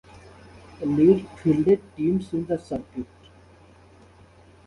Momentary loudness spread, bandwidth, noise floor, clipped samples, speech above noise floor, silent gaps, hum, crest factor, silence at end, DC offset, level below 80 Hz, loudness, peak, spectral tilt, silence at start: 16 LU; 11 kHz; -52 dBFS; under 0.1%; 30 dB; none; none; 20 dB; 1.65 s; under 0.1%; -54 dBFS; -23 LUFS; -6 dBFS; -9 dB/octave; 0.8 s